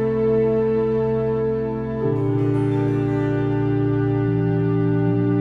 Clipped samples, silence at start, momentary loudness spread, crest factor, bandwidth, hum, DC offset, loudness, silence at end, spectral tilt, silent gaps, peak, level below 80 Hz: under 0.1%; 0 s; 3 LU; 10 dB; 4.7 kHz; none; under 0.1%; -21 LUFS; 0 s; -10.5 dB/octave; none; -10 dBFS; -42 dBFS